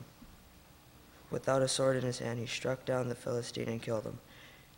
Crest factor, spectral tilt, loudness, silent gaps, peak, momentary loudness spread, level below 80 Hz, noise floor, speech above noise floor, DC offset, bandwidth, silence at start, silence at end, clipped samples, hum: 18 dB; -4.5 dB/octave; -35 LUFS; none; -18 dBFS; 18 LU; -64 dBFS; -58 dBFS; 24 dB; under 0.1%; 16.5 kHz; 0 s; 0.15 s; under 0.1%; none